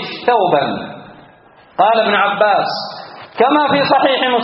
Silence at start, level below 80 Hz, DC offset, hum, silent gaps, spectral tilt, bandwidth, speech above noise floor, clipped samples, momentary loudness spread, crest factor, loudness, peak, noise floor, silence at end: 0 s; -60 dBFS; under 0.1%; none; none; -1.5 dB/octave; 6 kHz; 32 dB; under 0.1%; 16 LU; 16 dB; -14 LUFS; 0 dBFS; -45 dBFS; 0 s